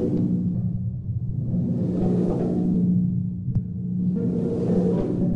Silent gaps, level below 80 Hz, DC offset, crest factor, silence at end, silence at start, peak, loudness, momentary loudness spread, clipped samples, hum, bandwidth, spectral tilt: none; -42 dBFS; under 0.1%; 12 dB; 0 s; 0 s; -10 dBFS; -24 LUFS; 6 LU; under 0.1%; none; 2.6 kHz; -11.5 dB/octave